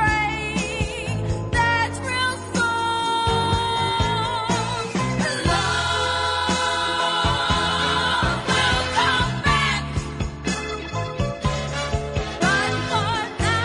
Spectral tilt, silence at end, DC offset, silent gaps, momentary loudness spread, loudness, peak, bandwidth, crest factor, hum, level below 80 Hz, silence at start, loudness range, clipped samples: -4 dB/octave; 0 s; under 0.1%; none; 7 LU; -22 LUFS; -6 dBFS; 11 kHz; 16 dB; none; -36 dBFS; 0 s; 4 LU; under 0.1%